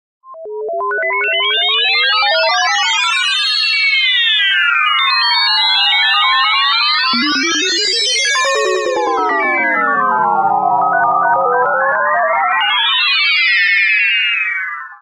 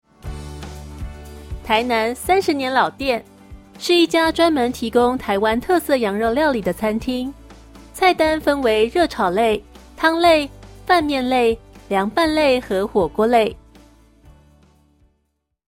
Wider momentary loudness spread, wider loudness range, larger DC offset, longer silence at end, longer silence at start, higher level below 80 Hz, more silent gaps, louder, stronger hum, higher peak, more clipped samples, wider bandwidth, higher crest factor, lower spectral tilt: second, 5 LU vs 18 LU; about the same, 3 LU vs 3 LU; neither; second, 0.05 s vs 2.15 s; about the same, 0.25 s vs 0.25 s; second, -66 dBFS vs -42 dBFS; neither; first, -12 LUFS vs -18 LUFS; neither; about the same, -2 dBFS vs -2 dBFS; neither; second, 14 kHz vs 16.5 kHz; about the same, 12 dB vs 16 dB; second, 0 dB/octave vs -4.5 dB/octave